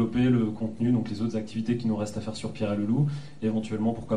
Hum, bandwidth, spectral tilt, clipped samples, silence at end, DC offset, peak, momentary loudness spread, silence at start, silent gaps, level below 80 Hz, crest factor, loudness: none; 10.5 kHz; -7.5 dB/octave; under 0.1%; 0 s; 0.7%; -12 dBFS; 8 LU; 0 s; none; -56 dBFS; 14 dB; -28 LUFS